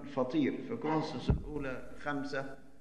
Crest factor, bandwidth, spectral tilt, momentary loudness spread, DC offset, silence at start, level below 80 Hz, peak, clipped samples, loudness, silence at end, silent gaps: 18 dB; 10.5 kHz; -7.5 dB/octave; 9 LU; 0.4%; 0 s; -46 dBFS; -16 dBFS; under 0.1%; -36 LUFS; 0 s; none